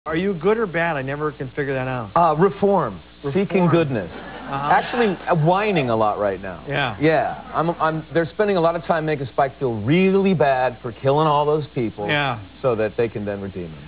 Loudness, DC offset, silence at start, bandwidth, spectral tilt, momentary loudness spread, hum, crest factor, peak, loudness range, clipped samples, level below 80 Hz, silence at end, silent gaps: -20 LUFS; 0.2%; 0.05 s; 4 kHz; -10.5 dB/octave; 9 LU; none; 16 dB; -6 dBFS; 2 LU; under 0.1%; -48 dBFS; 0 s; none